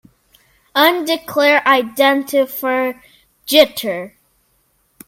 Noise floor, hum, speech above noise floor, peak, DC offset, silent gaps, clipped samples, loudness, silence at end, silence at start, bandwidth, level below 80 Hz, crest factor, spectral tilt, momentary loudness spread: -61 dBFS; none; 46 dB; 0 dBFS; under 0.1%; none; under 0.1%; -15 LUFS; 1 s; 0.75 s; 17 kHz; -60 dBFS; 18 dB; -2.5 dB/octave; 11 LU